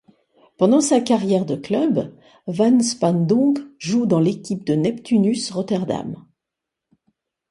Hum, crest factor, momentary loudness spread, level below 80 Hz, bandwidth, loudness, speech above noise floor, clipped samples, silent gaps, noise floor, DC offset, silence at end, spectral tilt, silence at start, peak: none; 18 dB; 10 LU; -62 dBFS; 11.5 kHz; -19 LUFS; 65 dB; under 0.1%; none; -84 dBFS; under 0.1%; 1.35 s; -6 dB/octave; 0.6 s; -2 dBFS